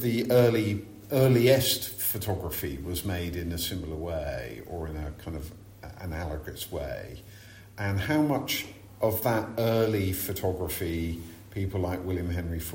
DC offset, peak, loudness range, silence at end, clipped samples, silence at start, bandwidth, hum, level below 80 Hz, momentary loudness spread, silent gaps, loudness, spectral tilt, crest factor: under 0.1%; -8 dBFS; 10 LU; 0 s; under 0.1%; 0 s; 16.5 kHz; none; -48 dBFS; 17 LU; none; -29 LUFS; -5.5 dB/octave; 20 dB